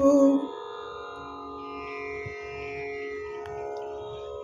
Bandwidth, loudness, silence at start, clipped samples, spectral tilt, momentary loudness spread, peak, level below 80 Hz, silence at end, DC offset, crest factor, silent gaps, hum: 7.4 kHz; -31 LUFS; 0 s; under 0.1%; -6 dB/octave; 16 LU; -10 dBFS; -58 dBFS; 0 s; under 0.1%; 18 dB; none; none